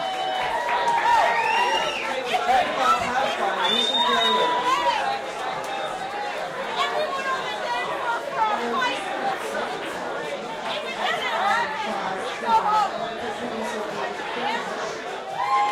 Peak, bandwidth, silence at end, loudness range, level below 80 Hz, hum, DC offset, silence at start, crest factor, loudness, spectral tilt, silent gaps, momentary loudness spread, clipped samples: -8 dBFS; 16.5 kHz; 0 s; 5 LU; -60 dBFS; none; under 0.1%; 0 s; 16 dB; -24 LUFS; -2 dB/octave; none; 10 LU; under 0.1%